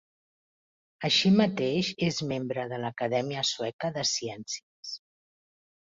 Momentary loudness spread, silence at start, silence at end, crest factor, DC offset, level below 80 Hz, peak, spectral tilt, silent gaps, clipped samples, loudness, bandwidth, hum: 14 LU; 1 s; 0.9 s; 20 dB; under 0.1%; -68 dBFS; -10 dBFS; -4 dB/octave; 3.73-3.79 s, 4.63-4.83 s; under 0.1%; -28 LUFS; 7.8 kHz; none